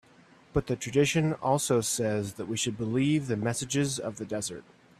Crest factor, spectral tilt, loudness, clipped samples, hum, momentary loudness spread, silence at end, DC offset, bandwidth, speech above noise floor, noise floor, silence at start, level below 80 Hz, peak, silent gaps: 16 dB; -4.5 dB/octave; -29 LUFS; under 0.1%; none; 8 LU; 0.4 s; under 0.1%; 15 kHz; 29 dB; -58 dBFS; 0.55 s; -56 dBFS; -12 dBFS; none